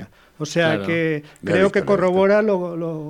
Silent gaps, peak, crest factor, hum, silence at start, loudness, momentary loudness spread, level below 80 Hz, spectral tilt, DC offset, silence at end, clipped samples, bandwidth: none; -2 dBFS; 16 dB; none; 0 s; -19 LUFS; 9 LU; -56 dBFS; -6 dB/octave; under 0.1%; 0 s; under 0.1%; 12 kHz